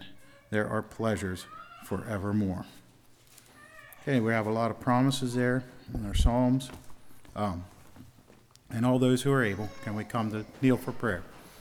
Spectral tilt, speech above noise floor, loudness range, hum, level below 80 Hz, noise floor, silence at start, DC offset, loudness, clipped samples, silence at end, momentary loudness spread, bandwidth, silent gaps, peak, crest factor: -6.5 dB/octave; 29 dB; 5 LU; none; -42 dBFS; -58 dBFS; 0 s; under 0.1%; -30 LUFS; under 0.1%; 0 s; 18 LU; 17 kHz; none; -10 dBFS; 20 dB